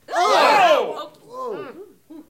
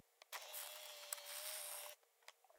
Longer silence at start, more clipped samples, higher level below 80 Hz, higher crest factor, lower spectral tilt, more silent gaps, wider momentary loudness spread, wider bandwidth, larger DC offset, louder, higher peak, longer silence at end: about the same, 0.1 s vs 0.2 s; neither; first, -70 dBFS vs under -90 dBFS; second, 16 dB vs 30 dB; first, -2 dB/octave vs 5.5 dB/octave; neither; first, 21 LU vs 15 LU; about the same, 16.5 kHz vs 18 kHz; neither; first, -16 LUFS vs -49 LUFS; first, -4 dBFS vs -24 dBFS; about the same, 0.05 s vs 0 s